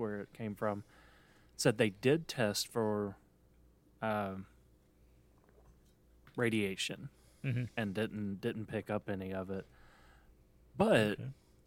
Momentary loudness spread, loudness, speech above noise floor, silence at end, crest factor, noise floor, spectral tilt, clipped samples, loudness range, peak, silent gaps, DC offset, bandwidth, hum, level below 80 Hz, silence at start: 15 LU; -36 LUFS; 30 dB; 0.35 s; 24 dB; -66 dBFS; -5 dB/octave; under 0.1%; 6 LU; -14 dBFS; none; under 0.1%; 16.5 kHz; none; -66 dBFS; 0 s